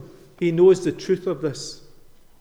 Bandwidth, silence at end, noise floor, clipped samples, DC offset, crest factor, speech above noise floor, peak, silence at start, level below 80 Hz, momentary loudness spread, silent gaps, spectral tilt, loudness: 10.5 kHz; 0.65 s; -47 dBFS; under 0.1%; under 0.1%; 16 dB; 27 dB; -6 dBFS; 0 s; -54 dBFS; 15 LU; none; -6.5 dB/octave; -21 LUFS